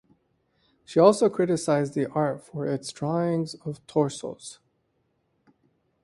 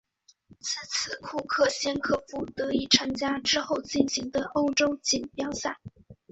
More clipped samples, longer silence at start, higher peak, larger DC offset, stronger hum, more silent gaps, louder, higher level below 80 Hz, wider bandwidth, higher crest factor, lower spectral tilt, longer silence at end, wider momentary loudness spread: neither; first, 0.9 s vs 0.65 s; about the same, -4 dBFS vs -6 dBFS; neither; neither; neither; about the same, -25 LUFS vs -27 LUFS; second, -68 dBFS vs -58 dBFS; first, 11.5 kHz vs 8.2 kHz; about the same, 22 dB vs 24 dB; first, -6 dB/octave vs -2.5 dB/octave; first, 1.5 s vs 0.2 s; first, 17 LU vs 10 LU